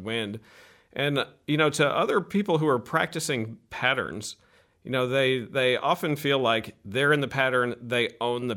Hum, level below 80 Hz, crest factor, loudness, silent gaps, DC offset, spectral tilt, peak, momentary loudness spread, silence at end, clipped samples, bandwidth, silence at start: none; -66 dBFS; 20 dB; -25 LUFS; none; under 0.1%; -4.5 dB/octave; -6 dBFS; 10 LU; 0 s; under 0.1%; 17 kHz; 0 s